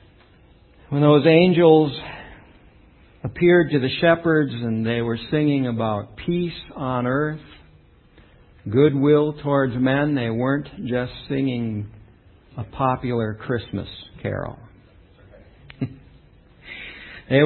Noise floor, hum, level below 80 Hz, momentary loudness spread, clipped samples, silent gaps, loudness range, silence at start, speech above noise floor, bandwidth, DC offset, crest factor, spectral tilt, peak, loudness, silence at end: -52 dBFS; none; -50 dBFS; 20 LU; under 0.1%; none; 11 LU; 0.9 s; 32 dB; 4.4 kHz; under 0.1%; 20 dB; -12 dB/octave; -2 dBFS; -21 LUFS; 0 s